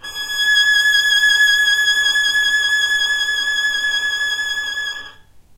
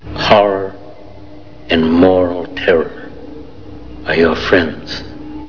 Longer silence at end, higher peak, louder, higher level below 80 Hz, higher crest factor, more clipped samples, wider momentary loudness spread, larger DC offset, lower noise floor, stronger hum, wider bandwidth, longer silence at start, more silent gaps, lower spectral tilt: first, 0.35 s vs 0 s; second, -4 dBFS vs 0 dBFS; about the same, -14 LUFS vs -13 LUFS; second, -52 dBFS vs -38 dBFS; about the same, 12 dB vs 16 dB; neither; second, 9 LU vs 23 LU; second, under 0.1% vs 2%; first, -43 dBFS vs -36 dBFS; neither; first, 16 kHz vs 5.4 kHz; about the same, 0.05 s vs 0 s; neither; second, 3 dB/octave vs -6.5 dB/octave